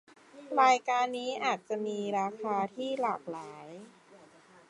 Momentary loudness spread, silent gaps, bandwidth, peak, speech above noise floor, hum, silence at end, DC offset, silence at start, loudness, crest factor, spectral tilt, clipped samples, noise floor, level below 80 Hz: 20 LU; none; 11 kHz; -10 dBFS; 27 dB; none; 0.55 s; under 0.1%; 0.35 s; -31 LUFS; 22 dB; -4 dB/octave; under 0.1%; -58 dBFS; -86 dBFS